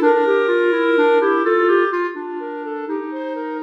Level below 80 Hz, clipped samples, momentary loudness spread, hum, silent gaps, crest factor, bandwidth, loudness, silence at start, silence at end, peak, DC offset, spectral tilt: -80 dBFS; under 0.1%; 12 LU; none; none; 12 dB; 6 kHz; -18 LUFS; 0 s; 0 s; -4 dBFS; under 0.1%; -4 dB/octave